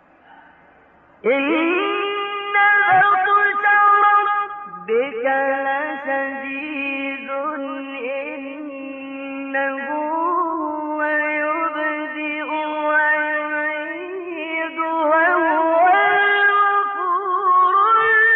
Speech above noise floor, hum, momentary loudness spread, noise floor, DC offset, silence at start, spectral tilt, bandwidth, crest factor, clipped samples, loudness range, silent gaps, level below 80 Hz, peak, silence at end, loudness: 34 dB; none; 14 LU; -51 dBFS; under 0.1%; 1.25 s; 0 dB/octave; 4.2 kHz; 14 dB; under 0.1%; 9 LU; none; -70 dBFS; -6 dBFS; 0 s; -18 LUFS